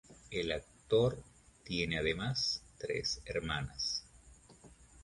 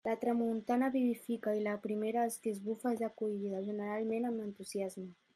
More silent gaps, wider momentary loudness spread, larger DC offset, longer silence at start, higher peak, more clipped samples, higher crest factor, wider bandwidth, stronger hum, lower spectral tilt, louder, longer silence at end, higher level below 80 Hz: neither; about the same, 9 LU vs 7 LU; neither; about the same, 0.1 s vs 0.05 s; first, -18 dBFS vs -22 dBFS; neither; first, 20 dB vs 14 dB; second, 11.5 kHz vs 14.5 kHz; neither; second, -4 dB/octave vs -6 dB/octave; about the same, -36 LUFS vs -36 LUFS; second, 0 s vs 0.25 s; first, -56 dBFS vs -82 dBFS